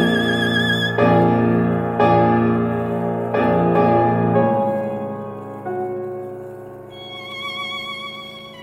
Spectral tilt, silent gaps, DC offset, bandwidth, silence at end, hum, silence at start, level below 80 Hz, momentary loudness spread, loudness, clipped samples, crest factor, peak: -7 dB/octave; none; under 0.1%; 14.5 kHz; 0 s; none; 0 s; -50 dBFS; 17 LU; -18 LUFS; under 0.1%; 16 dB; -4 dBFS